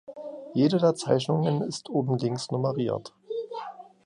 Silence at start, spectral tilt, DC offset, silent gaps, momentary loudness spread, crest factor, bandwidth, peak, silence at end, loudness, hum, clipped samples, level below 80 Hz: 0.1 s; -6.5 dB/octave; under 0.1%; none; 15 LU; 18 dB; 11 kHz; -8 dBFS; 0.2 s; -27 LUFS; none; under 0.1%; -68 dBFS